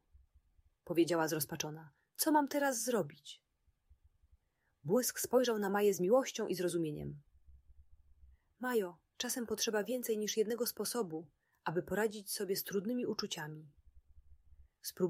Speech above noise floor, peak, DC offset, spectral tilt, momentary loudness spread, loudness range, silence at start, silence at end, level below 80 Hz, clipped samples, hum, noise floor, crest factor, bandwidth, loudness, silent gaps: 40 dB; -18 dBFS; under 0.1%; -4 dB/octave; 15 LU; 5 LU; 0.85 s; 0 s; -70 dBFS; under 0.1%; none; -75 dBFS; 20 dB; 16 kHz; -36 LUFS; none